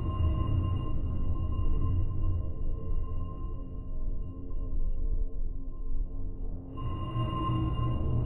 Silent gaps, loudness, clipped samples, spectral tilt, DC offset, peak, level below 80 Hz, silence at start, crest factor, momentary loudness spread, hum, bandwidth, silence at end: none; -35 LUFS; under 0.1%; -10.5 dB/octave; under 0.1%; -16 dBFS; -32 dBFS; 0 s; 12 dB; 11 LU; none; 3 kHz; 0 s